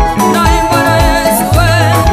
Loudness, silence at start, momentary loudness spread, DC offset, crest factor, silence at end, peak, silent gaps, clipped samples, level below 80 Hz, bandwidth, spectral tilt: -9 LUFS; 0 s; 1 LU; under 0.1%; 8 dB; 0 s; 0 dBFS; none; under 0.1%; -18 dBFS; 15.5 kHz; -5 dB/octave